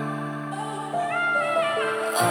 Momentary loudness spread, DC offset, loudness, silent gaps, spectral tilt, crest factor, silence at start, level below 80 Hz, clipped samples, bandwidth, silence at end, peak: 9 LU; under 0.1%; -25 LUFS; none; -4 dB/octave; 16 dB; 0 s; -74 dBFS; under 0.1%; 20 kHz; 0 s; -10 dBFS